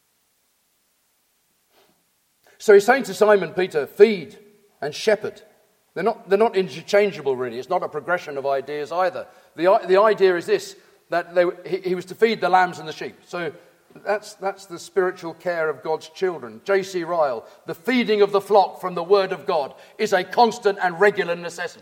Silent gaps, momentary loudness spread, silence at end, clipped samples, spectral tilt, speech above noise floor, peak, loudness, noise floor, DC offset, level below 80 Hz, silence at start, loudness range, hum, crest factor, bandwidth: none; 14 LU; 0.1 s; under 0.1%; -4.5 dB/octave; 46 dB; 0 dBFS; -21 LUFS; -67 dBFS; under 0.1%; -76 dBFS; 2.6 s; 5 LU; none; 22 dB; 16 kHz